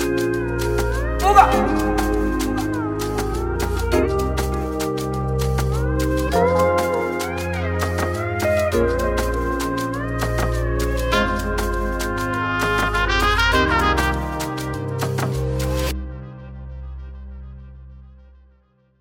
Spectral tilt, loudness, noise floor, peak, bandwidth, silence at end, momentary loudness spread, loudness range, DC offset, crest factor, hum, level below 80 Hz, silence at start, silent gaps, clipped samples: -5.5 dB/octave; -21 LUFS; -58 dBFS; 0 dBFS; 17 kHz; 0.8 s; 9 LU; 7 LU; under 0.1%; 20 dB; none; -28 dBFS; 0 s; none; under 0.1%